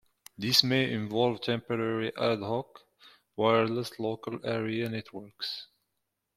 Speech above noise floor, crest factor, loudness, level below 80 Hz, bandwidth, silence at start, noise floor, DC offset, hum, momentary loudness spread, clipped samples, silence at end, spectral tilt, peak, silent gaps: 53 dB; 24 dB; -29 LUFS; -68 dBFS; 16.5 kHz; 0.4 s; -83 dBFS; under 0.1%; none; 13 LU; under 0.1%; 0.7 s; -4.5 dB/octave; -8 dBFS; none